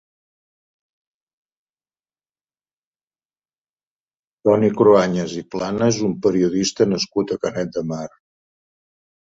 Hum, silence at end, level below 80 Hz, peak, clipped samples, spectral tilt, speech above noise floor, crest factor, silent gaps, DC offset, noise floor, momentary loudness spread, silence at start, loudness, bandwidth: none; 1.3 s; -56 dBFS; -2 dBFS; under 0.1%; -5.5 dB/octave; over 72 dB; 20 dB; none; under 0.1%; under -90 dBFS; 12 LU; 4.45 s; -19 LUFS; 7.8 kHz